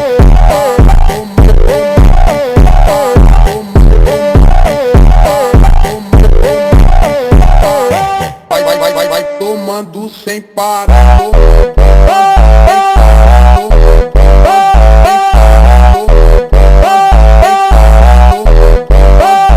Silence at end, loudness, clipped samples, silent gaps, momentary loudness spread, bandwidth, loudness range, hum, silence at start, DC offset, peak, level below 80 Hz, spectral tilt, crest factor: 0 s; -7 LUFS; 10%; none; 7 LU; 14.5 kHz; 4 LU; none; 0 s; under 0.1%; 0 dBFS; -6 dBFS; -6.5 dB/octave; 4 dB